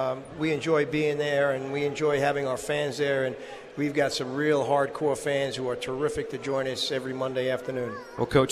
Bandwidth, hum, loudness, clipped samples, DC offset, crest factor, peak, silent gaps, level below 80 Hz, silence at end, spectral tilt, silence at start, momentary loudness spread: 14 kHz; none; -27 LUFS; under 0.1%; under 0.1%; 20 dB; -8 dBFS; none; -58 dBFS; 0 s; -5 dB/octave; 0 s; 7 LU